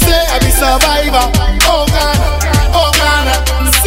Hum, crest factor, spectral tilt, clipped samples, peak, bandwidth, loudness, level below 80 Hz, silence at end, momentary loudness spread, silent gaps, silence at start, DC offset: none; 10 dB; -3.5 dB/octave; 0.2%; 0 dBFS; 16.5 kHz; -10 LUFS; -14 dBFS; 0 s; 3 LU; none; 0 s; under 0.1%